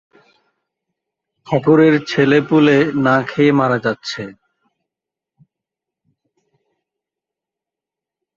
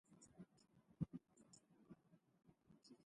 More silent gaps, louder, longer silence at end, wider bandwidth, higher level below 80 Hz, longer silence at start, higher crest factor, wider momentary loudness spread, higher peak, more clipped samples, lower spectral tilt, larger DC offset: neither; first, -14 LUFS vs -56 LUFS; first, 4.05 s vs 0 s; second, 7.4 kHz vs 11 kHz; first, -60 dBFS vs -78 dBFS; first, 1.5 s vs 0.1 s; second, 18 dB vs 28 dB; second, 13 LU vs 17 LU; first, -2 dBFS vs -32 dBFS; neither; about the same, -7 dB/octave vs -7 dB/octave; neither